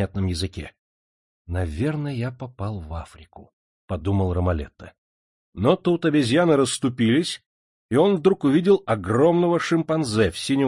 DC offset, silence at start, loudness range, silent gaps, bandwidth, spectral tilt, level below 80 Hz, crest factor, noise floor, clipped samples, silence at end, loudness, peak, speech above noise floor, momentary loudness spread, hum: under 0.1%; 0 s; 10 LU; 0.79-1.45 s, 3.53-3.88 s, 4.98-5.53 s, 7.46-7.89 s; 11.5 kHz; -6 dB/octave; -46 dBFS; 18 dB; under -90 dBFS; under 0.1%; 0 s; -22 LUFS; -4 dBFS; over 69 dB; 15 LU; none